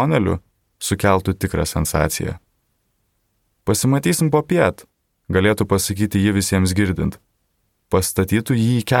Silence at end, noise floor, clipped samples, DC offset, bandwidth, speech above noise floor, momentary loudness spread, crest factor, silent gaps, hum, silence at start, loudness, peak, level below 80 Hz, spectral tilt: 0 s; -68 dBFS; under 0.1%; under 0.1%; 18 kHz; 50 dB; 7 LU; 18 dB; none; none; 0 s; -19 LUFS; 0 dBFS; -38 dBFS; -5.5 dB/octave